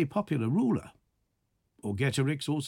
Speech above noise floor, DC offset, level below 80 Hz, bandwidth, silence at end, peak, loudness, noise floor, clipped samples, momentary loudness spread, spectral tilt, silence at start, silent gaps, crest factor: 48 dB; under 0.1%; -64 dBFS; 16 kHz; 0 s; -16 dBFS; -30 LUFS; -77 dBFS; under 0.1%; 8 LU; -6.5 dB/octave; 0 s; none; 16 dB